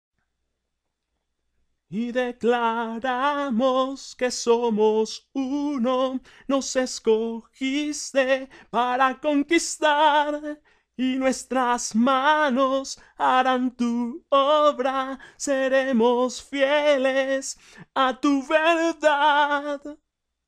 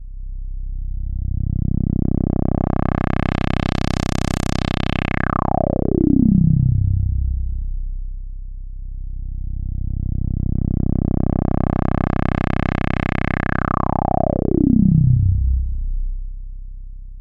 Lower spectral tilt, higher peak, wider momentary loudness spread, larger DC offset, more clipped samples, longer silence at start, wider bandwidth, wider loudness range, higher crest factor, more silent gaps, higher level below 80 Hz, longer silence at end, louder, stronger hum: second, -3 dB/octave vs -8 dB/octave; second, -8 dBFS vs -4 dBFS; second, 10 LU vs 19 LU; neither; neither; first, 1.9 s vs 0 s; first, 14 kHz vs 9.8 kHz; second, 4 LU vs 7 LU; about the same, 16 dB vs 16 dB; neither; second, -62 dBFS vs -24 dBFS; first, 0.55 s vs 0 s; second, -23 LUFS vs -20 LUFS; neither